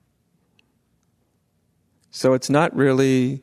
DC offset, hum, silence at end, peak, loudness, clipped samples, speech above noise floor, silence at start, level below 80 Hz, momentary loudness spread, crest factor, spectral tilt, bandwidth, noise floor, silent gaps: under 0.1%; none; 0.05 s; -2 dBFS; -19 LUFS; under 0.1%; 49 dB; 2.15 s; -64 dBFS; 5 LU; 20 dB; -6 dB/octave; 13 kHz; -67 dBFS; none